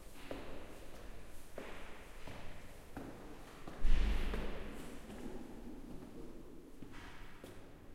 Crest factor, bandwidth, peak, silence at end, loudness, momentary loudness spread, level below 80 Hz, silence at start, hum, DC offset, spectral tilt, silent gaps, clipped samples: 22 dB; 13 kHz; -18 dBFS; 0 s; -48 LUFS; 15 LU; -42 dBFS; 0 s; none; under 0.1%; -5.5 dB/octave; none; under 0.1%